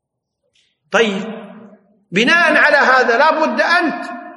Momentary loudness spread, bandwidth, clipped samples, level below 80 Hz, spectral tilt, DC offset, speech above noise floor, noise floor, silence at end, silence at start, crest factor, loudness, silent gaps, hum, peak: 15 LU; 11.5 kHz; under 0.1%; -68 dBFS; -3.5 dB/octave; under 0.1%; 58 dB; -72 dBFS; 0 s; 0.9 s; 16 dB; -13 LUFS; none; none; 0 dBFS